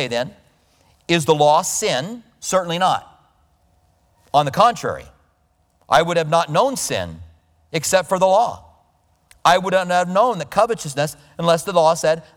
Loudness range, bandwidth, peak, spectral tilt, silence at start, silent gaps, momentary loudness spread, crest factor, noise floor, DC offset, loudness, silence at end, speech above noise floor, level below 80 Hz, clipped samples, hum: 3 LU; 19 kHz; -2 dBFS; -3.5 dB/octave; 0 s; none; 11 LU; 18 dB; -62 dBFS; under 0.1%; -18 LUFS; 0.15 s; 44 dB; -54 dBFS; under 0.1%; none